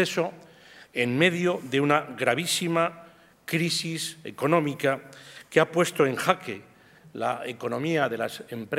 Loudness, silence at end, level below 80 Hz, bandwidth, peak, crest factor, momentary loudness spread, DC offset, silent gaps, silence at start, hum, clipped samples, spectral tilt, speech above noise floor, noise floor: -26 LUFS; 0 s; -72 dBFS; 16 kHz; -2 dBFS; 24 dB; 12 LU; under 0.1%; none; 0 s; none; under 0.1%; -4.5 dB/octave; 25 dB; -51 dBFS